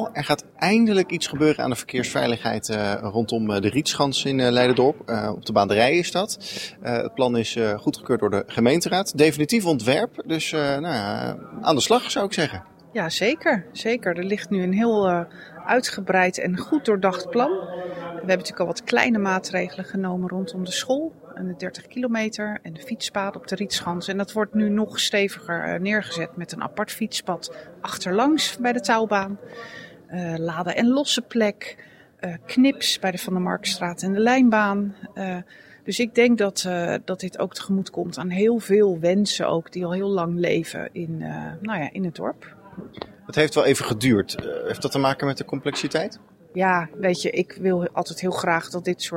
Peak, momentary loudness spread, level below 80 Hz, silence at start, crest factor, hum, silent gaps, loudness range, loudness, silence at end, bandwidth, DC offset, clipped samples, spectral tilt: -2 dBFS; 12 LU; -60 dBFS; 0 s; 20 dB; none; none; 4 LU; -23 LUFS; 0 s; 16.5 kHz; under 0.1%; under 0.1%; -4.5 dB/octave